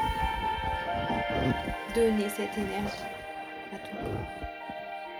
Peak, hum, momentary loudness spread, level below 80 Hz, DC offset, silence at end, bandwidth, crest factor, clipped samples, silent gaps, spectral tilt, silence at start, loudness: -14 dBFS; none; 12 LU; -44 dBFS; under 0.1%; 0 s; over 20 kHz; 16 dB; under 0.1%; none; -5.5 dB/octave; 0 s; -32 LUFS